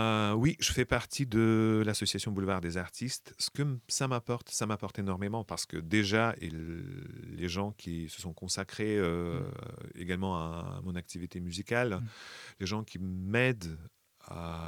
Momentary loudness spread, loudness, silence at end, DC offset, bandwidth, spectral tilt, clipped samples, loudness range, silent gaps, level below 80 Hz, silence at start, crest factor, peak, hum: 14 LU; -33 LUFS; 0 s; under 0.1%; 18 kHz; -4.5 dB/octave; under 0.1%; 5 LU; none; -54 dBFS; 0 s; 20 dB; -12 dBFS; none